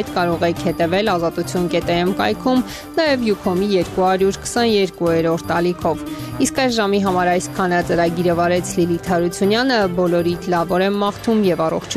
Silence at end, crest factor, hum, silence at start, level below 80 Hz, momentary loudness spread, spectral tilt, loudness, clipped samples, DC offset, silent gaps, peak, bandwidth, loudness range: 0 s; 14 dB; none; 0 s; -44 dBFS; 3 LU; -5 dB/octave; -18 LUFS; under 0.1%; under 0.1%; none; -4 dBFS; 15 kHz; 1 LU